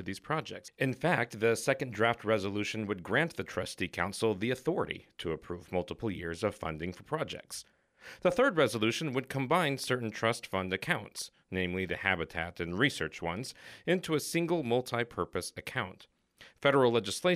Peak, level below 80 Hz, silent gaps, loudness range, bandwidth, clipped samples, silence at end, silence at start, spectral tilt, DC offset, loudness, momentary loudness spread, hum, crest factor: -12 dBFS; -62 dBFS; none; 4 LU; 15.5 kHz; under 0.1%; 0 s; 0 s; -5 dB/octave; under 0.1%; -32 LUFS; 10 LU; none; 22 dB